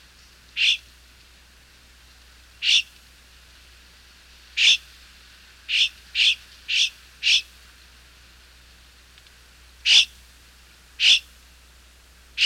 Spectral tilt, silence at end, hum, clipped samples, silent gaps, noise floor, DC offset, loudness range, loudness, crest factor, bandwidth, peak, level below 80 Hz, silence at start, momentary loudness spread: 3 dB/octave; 0 s; 60 Hz at -55 dBFS; under 0.1%; none; -52 dBFS; under 0.1%; 5 LU; -19 LUFS; 20 dB; 17 kHz; -6 dBFS; -54 dBFS; 0.55 s; 13 LU